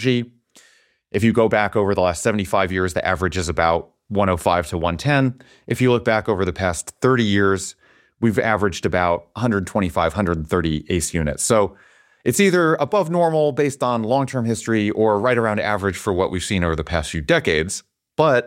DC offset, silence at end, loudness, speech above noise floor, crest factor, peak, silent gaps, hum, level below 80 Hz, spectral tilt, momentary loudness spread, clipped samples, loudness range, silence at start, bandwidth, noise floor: under 0.1%; 0 s; -20 LUFS; 38 dB; 18 dB; -2 dBFS; none; none; -42 dBFS; -5 dB/octave; 6 LU; under 0.1%; 2 LU; 0 s; 16.5 kHz; -57 dBFS